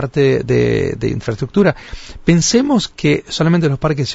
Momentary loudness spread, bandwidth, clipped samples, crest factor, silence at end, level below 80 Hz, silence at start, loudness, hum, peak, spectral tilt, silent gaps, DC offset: 8 LU; 8 kHz; under 0.1%; 14 dB; 0 s; -36 dBFS; 0 s; -15 LUFS; none; -2 dBFS; -5.5 dB/octave; none; under 0.1%